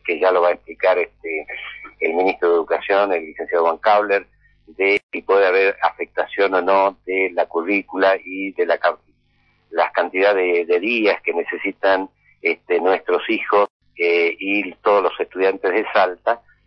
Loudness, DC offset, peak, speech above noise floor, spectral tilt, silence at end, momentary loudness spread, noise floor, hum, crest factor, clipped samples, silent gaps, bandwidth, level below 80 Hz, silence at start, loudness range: -19 LUFS; under 0.1%; -6 dBFS; 43 dB; -6 dB/octave; 0.3 s; 8 LU; -61 dBFS; 50 Hz at -65 dBFS; 14 dB; under 0.1%; 5.03-5.09 s, 13.70-13.80 s; 6 kHz; -62 dBFS; 0.05 s; 2 LU